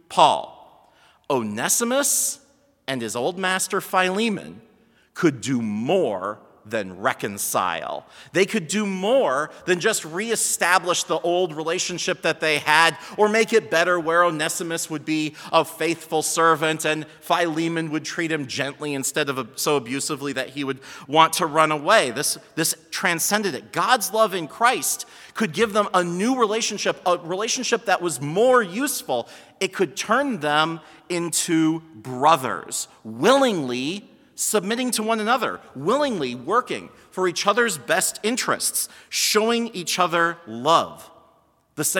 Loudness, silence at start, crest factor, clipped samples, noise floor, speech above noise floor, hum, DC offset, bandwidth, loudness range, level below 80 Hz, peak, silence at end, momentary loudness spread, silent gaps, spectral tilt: -22 LUFS; 0.1 s; 22 dB; under 0.1%; -60 dBFS; 38 dB; none; under 0.1%; 18 kHz; 4 LU; -72 dBFS; 0 dBFS; 0 s; 10 LU; none; -3 dB/octave